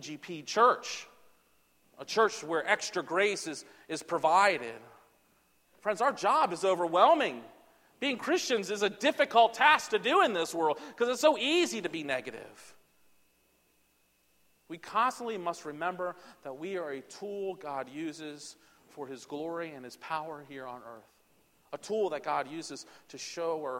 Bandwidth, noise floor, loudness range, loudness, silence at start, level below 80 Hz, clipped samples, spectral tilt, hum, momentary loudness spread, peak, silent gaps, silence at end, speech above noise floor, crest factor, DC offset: 16.5 kHz; -71 dBFS; 13 LU; -30 LUFS; 0 s; -80 dBFS; under 0.1%; -3 dB/octave; none; 20 LU; -8 dBFS; none; 0 s; 40 dB; 24 dB; under 0.1%